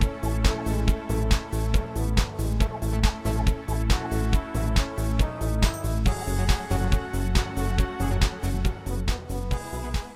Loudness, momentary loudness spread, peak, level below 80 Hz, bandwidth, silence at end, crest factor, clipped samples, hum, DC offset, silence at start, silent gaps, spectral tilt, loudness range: -27 LUFS; 4 LU; -6 dBFS; -26 dBFS; 15.5 kHz; 0 s; 18 dB; under 0.1%; none; under 0.1%; 0 s; none; -5.5 dB/octave; 1 LU